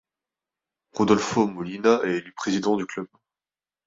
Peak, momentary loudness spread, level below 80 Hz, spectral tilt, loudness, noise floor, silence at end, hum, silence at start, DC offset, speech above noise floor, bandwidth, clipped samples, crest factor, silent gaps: -4 dBFS; 14 LU; -62 dBFS; -5 dB/octave; -24 LUFS; under -90 dBFS; 0.8 s; none; 0.95 s; under 0.1%; over 67 dB; 7.8 kHz; under 0.1%; 22 dB; none